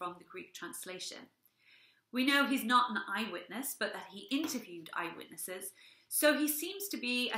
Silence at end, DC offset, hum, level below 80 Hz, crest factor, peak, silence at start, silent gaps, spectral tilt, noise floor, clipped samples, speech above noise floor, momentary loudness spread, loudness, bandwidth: 0 s; under 0.1%; none; -88 dBFS; 22 dB; -14 dBFS; 0 s; none; -2 dB/octave; -66 dBFS; under 0.1%; 30 dB; 15 LU; -34 LUFS; 16 kHz